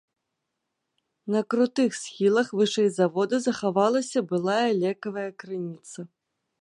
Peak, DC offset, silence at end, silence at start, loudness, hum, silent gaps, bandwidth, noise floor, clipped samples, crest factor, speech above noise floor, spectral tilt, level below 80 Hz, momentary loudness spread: -8 dBFS; under 0.1%; 0.55 s; 1.25 s; -25 LUFS; none; none; 11 kHz; -81 dBFS; under 0.1%; 18 dB; 57 dB; -5 dB/octave; -76 dBFS; 13 LU